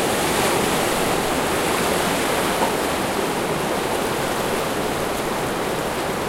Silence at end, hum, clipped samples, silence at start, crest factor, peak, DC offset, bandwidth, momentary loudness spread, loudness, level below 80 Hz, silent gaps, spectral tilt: 0 s; none; under 0.1%; 0 s; 14 dB; -6 dBFS; under 0.1%; 16 kHz; 4 LU; -21 LUFS; -42 dBFS; none; -3.5 dB/octave